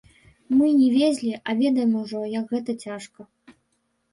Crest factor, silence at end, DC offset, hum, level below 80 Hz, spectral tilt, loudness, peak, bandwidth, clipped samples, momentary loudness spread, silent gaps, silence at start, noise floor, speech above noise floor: 14 dB; 0.9 s; under 0.1%; none; -66 dBFS; -5.5 dB/octave; -22 LUFS; -10 dBFS; 11.5 kHz; under 0.1%; 15 LU; none; 0.5 s; -72 dBFS; 50 dB